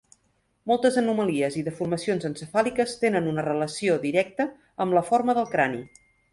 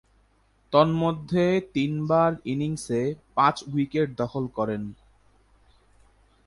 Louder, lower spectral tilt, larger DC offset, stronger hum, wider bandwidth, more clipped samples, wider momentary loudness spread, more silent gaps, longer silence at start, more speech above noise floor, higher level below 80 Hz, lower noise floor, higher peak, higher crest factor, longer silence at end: about the same, -25 LUFS vs -25 LUFS; second, -5.5 dB/octave vs -7 dB/octave; neither; neither; about the same, 11.5 kHz vs 11.5 kHz; neither; about the same, 7 LU vs 7 LU; neither; about the same, 0.65 s vs 0.7 s; first, 45 dB vs 39 dB; second, -64 dBFS vs -56 dBFS; first, -69 dBFS vs -63 dBFS; about the same, -8 dBFS vs -6 dBFS; about the same, 18 dB vs 20 dB; second, 0.45 s vs 1.5 s